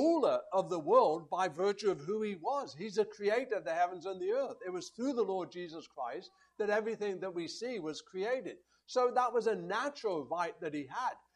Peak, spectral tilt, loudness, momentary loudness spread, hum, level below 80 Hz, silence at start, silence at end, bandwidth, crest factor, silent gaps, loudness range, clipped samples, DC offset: -14 dBFS; -5 dB/octave; -35 LUFS; 11 LU; none; -82 dBFS; 0 s; 0.15 s; 11 kHz; 20 dB; none; 5 LU; under 0.1%; under 0.1%